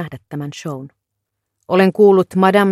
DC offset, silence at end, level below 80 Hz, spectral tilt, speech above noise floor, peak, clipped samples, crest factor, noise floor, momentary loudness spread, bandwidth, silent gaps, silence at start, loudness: under 0.1%; 0 s; -62 dBFS; -7 dB/octave; 63 dB; 0 dBFS; under 0.1%; 16 dB; -77 dBFS; 17 LU; 14.5 kHz; none; 0 s; -13 LUFS